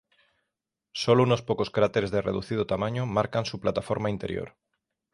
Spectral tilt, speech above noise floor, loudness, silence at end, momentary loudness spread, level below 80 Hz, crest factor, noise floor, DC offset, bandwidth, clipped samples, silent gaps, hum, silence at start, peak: -6.5 dB/octave; 59 dB; -27 LUFS; 0.65 s; 11 LU; -54 dBFS; 20 dB; -85 dBFS; under 0.1%; 11.5 kHz; under 0.1%; none; none; 0.95 s; -8 dBFS